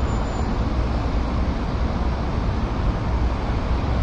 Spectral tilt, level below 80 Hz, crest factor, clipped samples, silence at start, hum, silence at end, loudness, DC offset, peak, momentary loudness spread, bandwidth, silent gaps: -7.5 dB/octave; -24 dBFS; 12 dB; under 0.1%; 0 s; none; 0 s; -24 LUFS; under 0.1%; -10 dBFS; 1 LU; 7.6 kHz; none